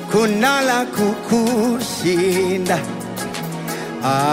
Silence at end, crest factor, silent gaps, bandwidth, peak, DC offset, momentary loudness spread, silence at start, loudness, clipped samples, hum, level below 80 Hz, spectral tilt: 0 s; 14 dB; none; 16 kHz; -4 dBFS; under 0.1%; 10 LU; 0 s; -19 LUFS; under 0.1%; none; -54 dBFS; -4.5 dB/octave